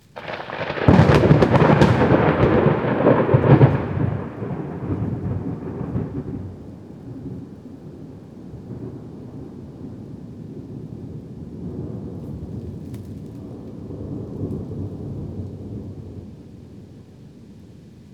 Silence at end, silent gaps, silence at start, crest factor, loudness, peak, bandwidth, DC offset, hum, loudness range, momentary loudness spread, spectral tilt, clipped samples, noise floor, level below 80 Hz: 0.05 s; none; 0.15 s; 22 dB; -19 LUFS; 0 dBFS; 8.6 kHz; under 0.1%; none; 20 LU; 24 LU; -8.5 dB/octave; under 0.1%; -43 dBFS; -40 dBFS